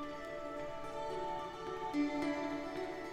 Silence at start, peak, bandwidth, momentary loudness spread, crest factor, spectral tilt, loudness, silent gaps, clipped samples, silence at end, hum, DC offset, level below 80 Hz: 0 s; -26 dBFS; 13.5 kHz; 8 LU; 14 dB; -5 dB/octave; -40 LUFS; none; under 0.1%; 0 s; none; under 0.1%; -62 dBFS